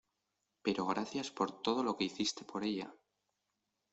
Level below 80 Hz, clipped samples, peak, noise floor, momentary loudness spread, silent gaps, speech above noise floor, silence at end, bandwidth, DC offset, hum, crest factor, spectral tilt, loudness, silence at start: -76 dBFS; under 0.1%; -20 dBFS; -86 dBFS; 6 LU; none; 49 dB; 0.95 s; 8.2 kHz; under 0.1%; 50 Hz at -65 dBFS; 20 dB; -4 dB/octave; -37 LUFS; 0.65 s